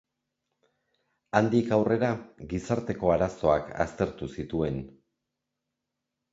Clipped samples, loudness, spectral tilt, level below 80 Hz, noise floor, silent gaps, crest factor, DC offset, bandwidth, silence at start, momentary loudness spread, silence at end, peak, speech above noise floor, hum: under 0.1%; -28 LUFS; -7.5 dB/octave; -50 dBFS; -85 dBFS; none; 24 dB; under 0.1%; 8 kHz; 1.35 s; 12 LU; 1.45 s; -4 dBFS; 58 dB; none